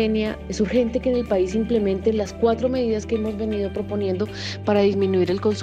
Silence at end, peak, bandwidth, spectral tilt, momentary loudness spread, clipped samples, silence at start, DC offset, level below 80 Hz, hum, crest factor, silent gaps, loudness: 0 s; -6 dBFS; 9.2 kHz; -6.5 dB/octave; 6 LU; under 0.1%; 0 s; under 0.1%; -40 dBFS; none; 14 dB; none; -22 LUFS